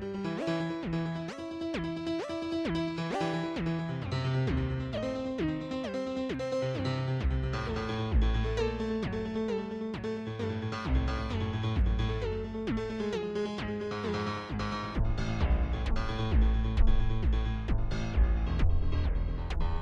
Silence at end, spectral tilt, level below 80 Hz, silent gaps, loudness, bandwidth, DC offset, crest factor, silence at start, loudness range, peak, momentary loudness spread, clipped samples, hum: 0 s; -7.5 dB/octave; -34 dBFS; none; -33 LUFS; 8.2 kHz; under 0.1%; 18 dB; 0 s; 3 LU; -12 dBFS; 5 LU; under 0.1%; none